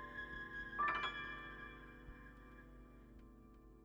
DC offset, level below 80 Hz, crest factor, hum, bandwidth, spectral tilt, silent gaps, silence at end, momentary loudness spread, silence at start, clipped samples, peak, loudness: under 0.1%; -62 dBFS; 20 dB; none; over 20 kHz; -4.5 dB/octave; none; 0 s; 23 LU; 0 s; under 0.1%; -28 dBFS; -44 LUFS